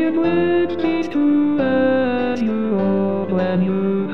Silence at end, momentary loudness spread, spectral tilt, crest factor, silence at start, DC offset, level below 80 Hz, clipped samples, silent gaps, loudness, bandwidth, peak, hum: 0 s; 3 LU; -8.5 dB/octave; 10 dB; 0 s; 2%; -56 dBFS; under 0.1%; none; -18 LUFS; 6.4 kHz; -8 dBFS; none